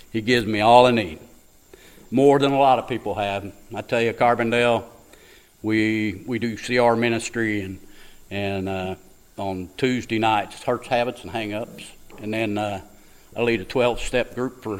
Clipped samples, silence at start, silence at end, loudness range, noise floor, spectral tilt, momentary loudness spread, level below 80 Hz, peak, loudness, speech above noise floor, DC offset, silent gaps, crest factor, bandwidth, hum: under 0.1%; 0.15 s; 0 s; 7 LU; -50 dBFS; -5.5 dB/octave; 16 LU; -48 dBFS; 0 dBFS; -22 LUFS; 29 dB; under 0.1%; none; 22 dB; 16 kHz; none